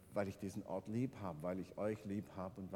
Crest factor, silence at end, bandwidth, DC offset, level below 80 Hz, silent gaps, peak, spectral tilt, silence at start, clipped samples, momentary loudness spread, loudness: 18 dB; 0 s; 18 kHz; under 0.1%; -72 dBFS; none; -26 dBFS; -7.5 dB/octave; 0 s; under 0.1%; 5 LU; -45 LUFS